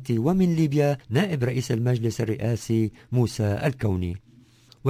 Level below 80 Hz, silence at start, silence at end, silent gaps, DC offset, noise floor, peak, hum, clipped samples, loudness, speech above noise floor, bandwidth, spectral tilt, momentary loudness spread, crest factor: -46 dBFS; 0 s; 0 s; none; under 0.1%; -54 dBFS; -8 dBFS; none; under 0.1%; -24 LUFS; 30 dB; 16 kHz; -7 dB/octave; 5 LU; 16 dB